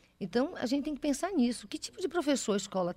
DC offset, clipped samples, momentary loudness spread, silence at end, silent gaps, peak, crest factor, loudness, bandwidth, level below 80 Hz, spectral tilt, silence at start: under 0.1%; under 0.1%; 6 LU; 0 s; none; -16 dBFS; 16 dB; -32 LUFS; 16 kHz; -62 dBFS; -4.5 dB/octave; 0.2 s